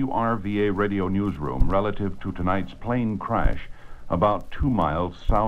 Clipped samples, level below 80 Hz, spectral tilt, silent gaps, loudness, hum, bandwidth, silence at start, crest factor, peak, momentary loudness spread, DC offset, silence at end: under 0.1%; -30 dBFS; -9 dB/octave; none; -25 LUFS; none; 5.4 kHz; 0 s; 18 dB; -6 dBFS; 6 LU; under 0.1%; 0 s